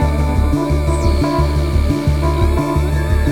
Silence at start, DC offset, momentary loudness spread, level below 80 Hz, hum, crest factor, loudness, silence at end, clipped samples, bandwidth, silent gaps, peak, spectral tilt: 0 s; under 0.1%; 1 LU; -18 dBFS; none; 12 dB; -16 LUFS; 0 s; under 0.1%; 14.5 kHz; none; -2 dBFS; -7 dB/octave